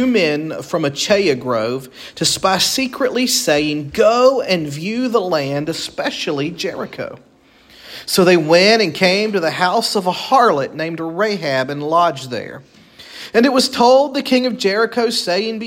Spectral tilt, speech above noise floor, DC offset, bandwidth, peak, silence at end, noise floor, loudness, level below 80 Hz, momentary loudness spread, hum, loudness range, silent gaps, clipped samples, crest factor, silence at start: -3.5 dB/octave; 32 dB; under 0.1%; 16.5 kHz; 0 dBFS; 0 s; -48 dBFS; -16 LUFS; -56 dBFS; 12 LU; none; 5 LU; none; under 0.1%; 16 dB; 0 s